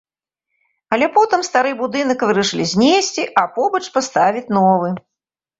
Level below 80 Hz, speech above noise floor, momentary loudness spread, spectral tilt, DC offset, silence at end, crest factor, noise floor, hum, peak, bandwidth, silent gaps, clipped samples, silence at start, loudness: -60 dBFS; 68 dB; 5 LU; -4 dB/octave; under 0.1%; 0.6 s; 16 dB; -84 dBFS; none; -2 dBFS; 8 kHz; none; under 0.1%; 0.9 s; -16 LUFS